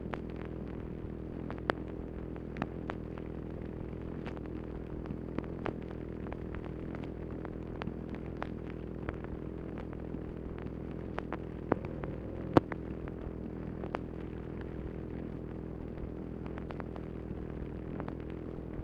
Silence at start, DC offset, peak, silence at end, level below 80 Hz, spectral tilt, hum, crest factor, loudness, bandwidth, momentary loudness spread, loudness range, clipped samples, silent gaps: 0 s; under 0.1%; -8 dBFS; 0 s; -48 dBFS; -9 dB/octave; none; 32 dB; -40 LUFS; 8.6 kHz; 6 LU; 5 LU; under 0.1%; none